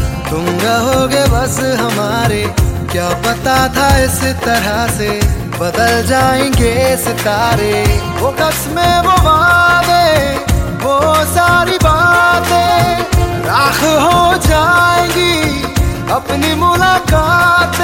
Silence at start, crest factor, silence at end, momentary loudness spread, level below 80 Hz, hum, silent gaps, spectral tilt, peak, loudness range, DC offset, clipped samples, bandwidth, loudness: 0 s; 10 dB; 0 s; 6 LU; -22 dBFS; none; none; -4.5 dB/octave; 0 dBFS; 3 LU; under 0.1%; under 0.1%; 17 kHz; -11 LUFS